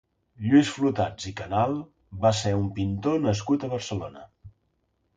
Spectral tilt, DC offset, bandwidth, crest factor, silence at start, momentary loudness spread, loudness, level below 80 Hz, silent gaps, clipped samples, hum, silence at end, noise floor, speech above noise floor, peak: -6 dB/octave; under 0.1%; 9.2 kHz; 18 dB; 0.4 s; 14 LU; -26 LUFS; -50 dBFS; none; under 0.1%; none; 0.65 s; -72 dBFS; 48 dB; -8 dBFS